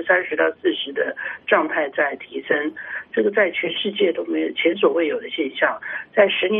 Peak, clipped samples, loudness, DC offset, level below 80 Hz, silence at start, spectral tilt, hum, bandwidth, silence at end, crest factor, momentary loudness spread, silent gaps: -2 dBFS; under 0.1%; -21 LUFS; under 0.1%; -70 dBFS; 0 s; -1 dB/octave; none; 3.9 kHz; 0 s; 18 dB; 7 LU; none